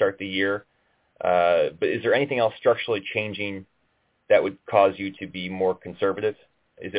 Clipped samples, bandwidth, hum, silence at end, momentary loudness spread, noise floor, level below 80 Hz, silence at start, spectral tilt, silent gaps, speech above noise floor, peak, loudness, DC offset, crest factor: under 0.1%; 4 kHz; none; 0 s; 11 LU; -69 dBFS; -60 dBFS; 0 s; -9 dB/octave; none; 46 dB; -6 dBFS; -24 LUFS; under 0.1%; 18 dB